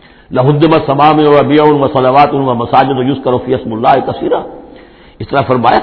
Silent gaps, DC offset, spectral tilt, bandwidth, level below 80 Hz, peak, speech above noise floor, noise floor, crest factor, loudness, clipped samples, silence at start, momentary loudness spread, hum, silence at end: none; under 0.1%; -9.5 dB/octave; 5.4 kHz; -40 dBFS; 0 dBFS; 27 dB; -36 dBFS; 10 dB; -10 LUFS; 0.8%; 0.3 s; 9 LU; none; 0 s